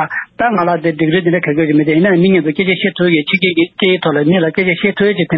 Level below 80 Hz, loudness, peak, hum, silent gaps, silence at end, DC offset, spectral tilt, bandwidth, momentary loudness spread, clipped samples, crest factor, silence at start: -52 dBFS; -13 LUFS; 0 dBFS; none; none; 0 s; under 0.1%; -10 dB/octave; 5.4 kHz; 3 LU; under 0.1%; 12 dB; 0 s